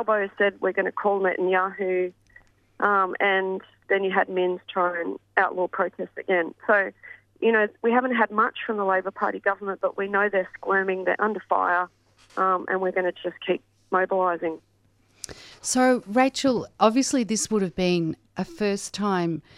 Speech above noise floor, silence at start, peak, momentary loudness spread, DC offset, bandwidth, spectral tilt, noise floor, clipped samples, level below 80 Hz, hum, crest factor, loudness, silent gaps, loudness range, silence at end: 39 dB; 0 s; -4 dBFS; 9 LU; under 0.1%; 14.5 kHz; -4 dB/octave; -63 dBFS; under 0.1%; -62 dBFS; none; 20 dB; -24 LUFS; none; 2 LU; 0.15 s